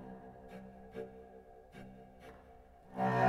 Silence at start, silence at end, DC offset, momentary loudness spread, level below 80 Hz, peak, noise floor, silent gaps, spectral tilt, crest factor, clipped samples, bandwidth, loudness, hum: 0 s; 0 s; under 0.1%; 16 LU; -64 dBFS; -20 dBFS; -59 dBFS; none; -7.5 dB/octave; 22 dB; under 0.1%; 14 kHz; -46 LUFS; none